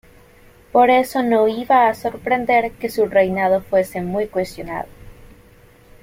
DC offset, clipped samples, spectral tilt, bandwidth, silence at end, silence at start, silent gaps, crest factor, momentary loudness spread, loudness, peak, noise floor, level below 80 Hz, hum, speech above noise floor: under 0.1%; under 0.1%; -5.5 dB/octave; 16.5 kHz; 0.8 s; 0.75 s; none; 16 dB; 11 LU; -18 LUFS; -2 dBFS; -48 dBFS; -48 dBFS; none; 31 dB